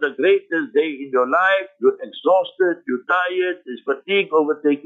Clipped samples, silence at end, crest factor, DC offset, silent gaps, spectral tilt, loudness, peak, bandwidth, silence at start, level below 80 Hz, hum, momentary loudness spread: under 0.1%; 0.05 s; 14 dB; under 0.1%; none; -6 dB/octave; -19 LUFS; -6 dBFS; 4 kHz; 0 s; -76 dBFS; none; 7 LU